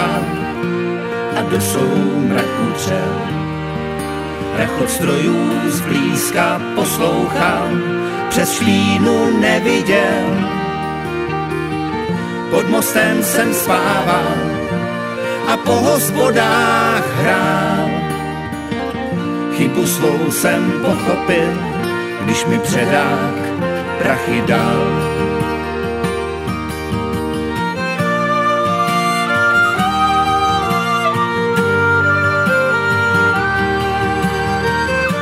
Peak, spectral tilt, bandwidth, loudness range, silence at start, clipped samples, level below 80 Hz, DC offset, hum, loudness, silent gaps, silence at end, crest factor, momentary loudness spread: 0 dBFS; -5 dB/octave; 16.5 kHz; 4 LU; 0 s; under 0.1%; -40 dBFS; under 0.1%; none; -16 LUFS; none; 0 s; 16 dB; 8 LU